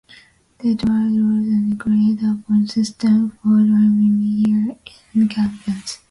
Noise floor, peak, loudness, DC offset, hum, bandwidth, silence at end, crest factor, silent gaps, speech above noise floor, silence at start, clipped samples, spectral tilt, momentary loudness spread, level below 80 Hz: -48 dBFS; -8 dBFS; -18 LUFS; under 0.1%; none; 11 kHz; 0.15 s; 10 dB; none; 32 dB; 0.6 s; under 0.1%; -7 dB/octave; 9 LU; -52 dBFS